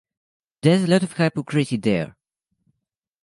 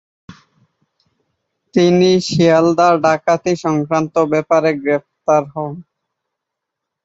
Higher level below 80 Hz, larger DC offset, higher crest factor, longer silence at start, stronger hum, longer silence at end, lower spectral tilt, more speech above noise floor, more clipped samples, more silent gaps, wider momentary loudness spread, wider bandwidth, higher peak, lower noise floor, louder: about the same, -60 dBFS vs -56 dBFS; neither; about the same, 20 dB vs 16 dB; first, 0.65 s vs 0.3 s; neither; about the same, 1.15 s vs 1.25 s; about the same, -6.5 dB/octave vs -6 dB/octave; second, 61 dB vs 66 dB; neither; neither; about the same, 6 LU vs 8 LU; first, 11.5 kHz vs 8 kHz; about the same, -4 dBFS vs -2 dBFS; about the same, -81 dBFS vs -80 dBFS; second, -21 LUFS vs -15 LUFS